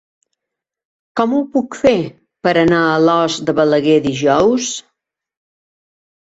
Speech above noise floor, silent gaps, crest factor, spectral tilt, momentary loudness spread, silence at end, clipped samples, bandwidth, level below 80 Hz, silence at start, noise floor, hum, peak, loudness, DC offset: 68 dB; none; 14 dB; -5 dB/octave; 8 LU; 1.4 s; under 0.1%; 8 kHz; -52 dBFS; 1.15 s; -82 dBFS; none; -2 dBFS; -15 LUFS; under 0.1%